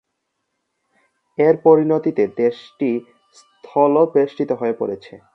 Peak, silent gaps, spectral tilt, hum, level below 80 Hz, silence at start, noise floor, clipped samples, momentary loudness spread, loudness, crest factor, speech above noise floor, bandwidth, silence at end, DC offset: 0 dBFS; none; -8.5 dB/octave; none; -68 dBFS; 1.4 s; -75 dBFS; under 0.1%; 12 LU; -18 LUFS; 18 dB; 58 dB; 6 kHz; 0.15 s; under 0.1%